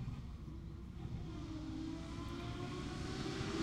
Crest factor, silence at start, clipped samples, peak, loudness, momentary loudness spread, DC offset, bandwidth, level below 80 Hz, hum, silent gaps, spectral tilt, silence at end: 18 dB; 0 s; under 0.1%; -26 dBFS; -46 LUFS; 8 LU; under 0.1%; 13.5 kHz; -52 dBFS; none; none; -6 dB/octave; 0 s